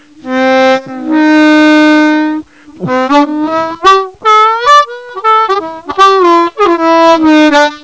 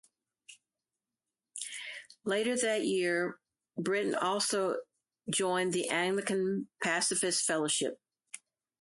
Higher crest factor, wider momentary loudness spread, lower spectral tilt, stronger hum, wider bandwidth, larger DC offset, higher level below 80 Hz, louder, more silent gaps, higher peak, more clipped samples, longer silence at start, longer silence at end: second, 8 dB vs 18 dB; second, 10 LU vs 15 LU; first, -4 dB/octave vs -2.5 dB/octave; neither; second, 8 kHz vs 11.5 kHz; first, 0.4% vs under 0.1%; first, -48 dBFS vs -80 dBFS; first, -8 LUFS vs -32 LUFS; neither; first, 0 dBFS vs -16 dBFS; first, 1% vs under 0.1%; second, 0.25 s vs 0.5 s; second, 0.05 s vs 0.45 s